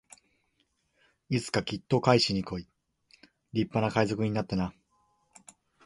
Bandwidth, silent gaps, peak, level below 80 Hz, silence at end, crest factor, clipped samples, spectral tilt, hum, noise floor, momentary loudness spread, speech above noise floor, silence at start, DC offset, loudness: 11.5 kHz; none; -6 dBFS; -58 dBFS; 1.15 s; 26 dB; under 0.1%; -5.5 dB/octave; none; -74 dBFS; 11 LU; 46 dB; 1.3 s; under 0.1%; -29 LUFS